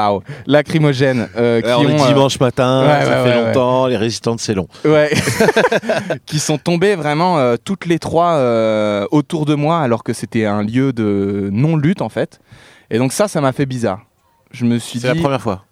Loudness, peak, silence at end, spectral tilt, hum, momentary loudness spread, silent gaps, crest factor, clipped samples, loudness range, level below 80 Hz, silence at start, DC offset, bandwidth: -15 LUFS; 0 dBFS; 0.1 s; -5.5 dB/octave; none; 7 LU; none; 14 dB; under 0.1%; 5 LU; -50 dBFS; 0 s; under 0.1%; 15.5 kHz